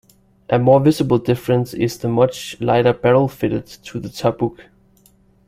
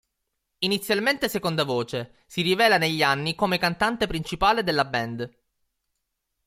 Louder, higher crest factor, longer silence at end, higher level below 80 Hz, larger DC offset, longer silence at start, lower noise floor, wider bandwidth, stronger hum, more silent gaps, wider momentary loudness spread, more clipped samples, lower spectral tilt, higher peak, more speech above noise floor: first, -17 LUFS vs -24 LUFS; about the same, 18 dB vs 18 dB; second, 0.85 s vs 1.2 s; about the same, -50 dBFS vs -50 dBFS; neither; about the same, 0.5 s vs 0.6 s; second, -54 dBFS vs -79 dBFS; about the same, 16 kHz vs 16.5 kHz; neither; neither; about the same, 11 LU vs 12 LU; neither; first, -7 dB/octave vs -4.5 dB/octave; first, 0 dBFS vs -6 dBFS; second, 37 dB vs 55 dB